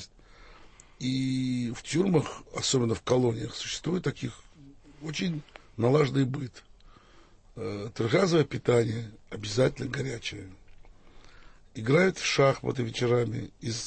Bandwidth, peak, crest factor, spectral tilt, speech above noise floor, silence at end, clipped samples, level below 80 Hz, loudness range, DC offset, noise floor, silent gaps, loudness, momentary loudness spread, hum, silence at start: 8.8 kHz; -10 dBFS; 18 dB; -5.5 dB/octave; 28 dB; 0 s; under 0.1%; -54 dBFS; 3 LU; under 0.1%; -56 dBFS; none; -28 LUFS; 15 LU; none; 0 s